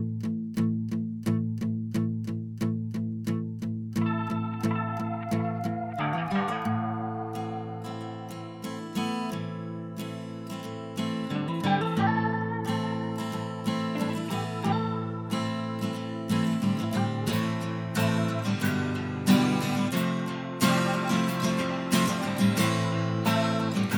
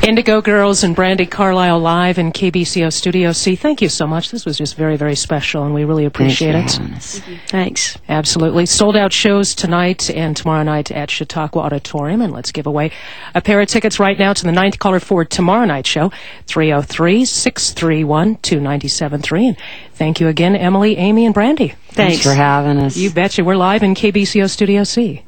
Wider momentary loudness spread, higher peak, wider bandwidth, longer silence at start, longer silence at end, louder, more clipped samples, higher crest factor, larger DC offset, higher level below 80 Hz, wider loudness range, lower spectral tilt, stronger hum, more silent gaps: about the same, 10 LU vs 8 LU; second, -10 dBFS vs 0 dBFS; about the same, 17.5 kHz vs 18 kHz; about the same, 0 s vs 0 s; about the same, 0 s vs 0.1 s; second, -29 LUFS vs -14 LUFS; neither; about the same, 18 dB vs 14 dB; second, under 0.1% vs 2%; second, -64 dBFS vs -42 dBFS; first, 7 LU vs 3 LU; first, -6 dB/octave vs -4.5 dB/octave; neither; neither